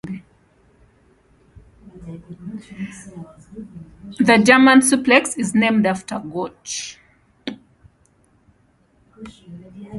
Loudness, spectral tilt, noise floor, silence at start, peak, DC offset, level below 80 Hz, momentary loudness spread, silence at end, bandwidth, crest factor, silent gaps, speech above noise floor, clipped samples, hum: -16 LUFS; -4 dB/octave; -59 dBFS; 0.05 s; 0 dBFS; under 0.1%; -56 dBFS; 28 LU; 0 s; 11.5 kHz; 22 dB; none; 40 dB; under 0.1%; none